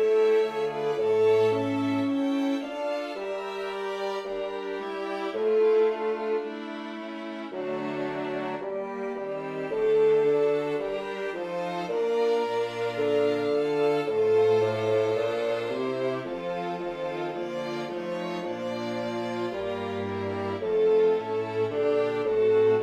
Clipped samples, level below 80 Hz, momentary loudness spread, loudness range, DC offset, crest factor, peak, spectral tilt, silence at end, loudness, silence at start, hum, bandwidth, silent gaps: under 0.1%; -66 dBFS; 11 LU; 6 LU; under 0.1%; 12 dB; -14 dBFS; -6.5 dB/octave; 0 s; -27 LUFS; 0 s; none; 8.8 kHz; none